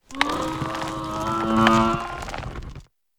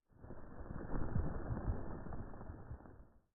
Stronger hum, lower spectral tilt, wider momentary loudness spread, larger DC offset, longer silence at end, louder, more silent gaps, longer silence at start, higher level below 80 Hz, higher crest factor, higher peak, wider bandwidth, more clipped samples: neither; second, -5 dB/octave vs -6.5 dB/octave; first, 17 LU vs 14 LU; neither; first, 0.35 s vs 0.15 s; first, -23 LUFS vs -46 LUFS; neither; about the same, 0.1 s vs 0.2 s; first, -42 dBFS vs -48 dBFS; first, 24 dB vs 18 dB; first, 0 dBFS vs -24 dBFS; first, over 20 kHz vs 1.9 kHz; neither